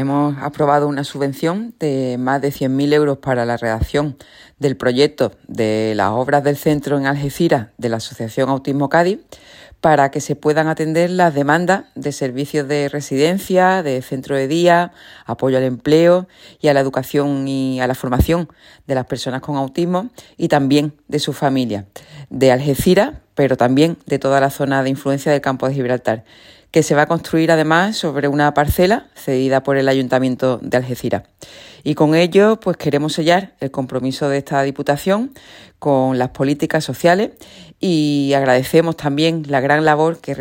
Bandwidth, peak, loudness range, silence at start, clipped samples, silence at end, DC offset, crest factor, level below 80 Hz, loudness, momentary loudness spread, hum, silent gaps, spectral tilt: 16.5 kHz; 0 dBFS; 3 LU; 0 s; under 0.1%; 0 s; under 0.1%; 16 dB; -40 dBFS; -17 LUFS; 8 LU; none; none; -6 dB/octave